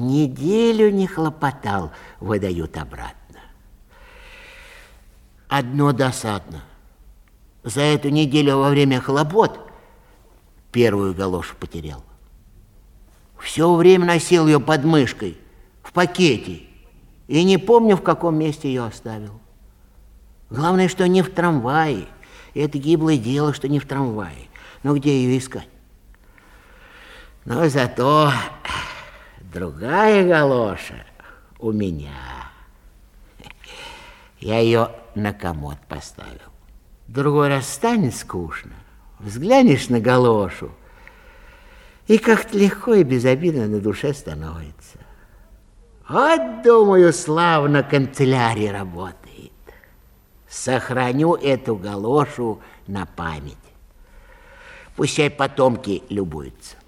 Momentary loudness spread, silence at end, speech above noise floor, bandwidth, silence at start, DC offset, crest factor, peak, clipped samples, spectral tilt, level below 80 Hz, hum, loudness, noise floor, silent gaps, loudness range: 20 LU; 0.15 s; 33 dB; 16 kHz; 0 s; under 0.1%; 20 dB; 0 dBFS; under 0.1%; -6 dB/octave; -46 dBFS; none; -18 LUFS; -51 dBFS; none; 8 LU